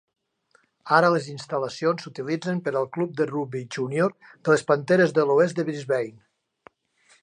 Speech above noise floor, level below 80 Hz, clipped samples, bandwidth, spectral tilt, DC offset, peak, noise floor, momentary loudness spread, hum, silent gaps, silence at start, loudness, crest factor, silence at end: 41 dB; -74 dBFS; under 0.1%; 10.5 kHz; -6 dB/octave; under 0.1%; -4 dBFS; -65 dBFS; 11 LU; none; none; 0.85 s; -24 LUFS; 22 dB; 1.15 s